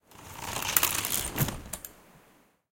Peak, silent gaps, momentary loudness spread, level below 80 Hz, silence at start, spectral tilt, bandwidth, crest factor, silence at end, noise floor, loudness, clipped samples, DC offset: -2 dBFS; none; 17 LU; -50 dBFS; 0.1 s; -2 dB/octave; 17 kHz; 32 dB; 0.6 s; -62 dBFS; -28 LUFS; under 0.1%; under 0.1%